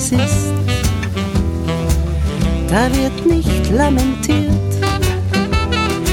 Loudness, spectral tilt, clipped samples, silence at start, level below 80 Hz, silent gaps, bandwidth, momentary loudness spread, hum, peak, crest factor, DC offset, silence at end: -16 LUFS; -5.5 dB/octave; under 0.1%; 0 s; -22 dBFS; none; 17.5 kHz; 4 LU; none; 0 dBFS; 14 dB; under 0.1%; 0 s